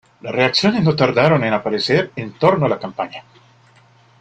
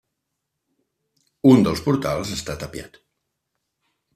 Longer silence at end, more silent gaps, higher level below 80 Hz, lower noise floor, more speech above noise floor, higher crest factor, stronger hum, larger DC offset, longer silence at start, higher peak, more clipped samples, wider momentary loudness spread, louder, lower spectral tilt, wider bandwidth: second, 1 s vs 1.3 s; neither; about the same, -54 dBFS vs -50 dBFS; second, -51 dBFS vs -79 dBFS; second, 34 dB vs 60 dB; about the same, 18 dB vs 20 dB; neither; neither; second, 0.25 s vs 1.45 s; first, 0 dBFS vs -4 dBFS; neither; second, 12 LU vs 18 LU; about the same, -17 LUFS vs -19 LUFS; about the same, -6 dB/octave vs -6.5 dB/octave; second, 9 kHz vs 14.5 kHz